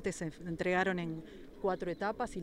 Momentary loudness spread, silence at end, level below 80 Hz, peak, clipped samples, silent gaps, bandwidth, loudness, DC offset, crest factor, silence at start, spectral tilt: 10 LU; 0 s; -58 dBFS; -18 dBFS; under 0.1%; none; 14 kHz; -36 LUFS; under 0.1%; 18 dB; 0 s; -5.5 dB/octave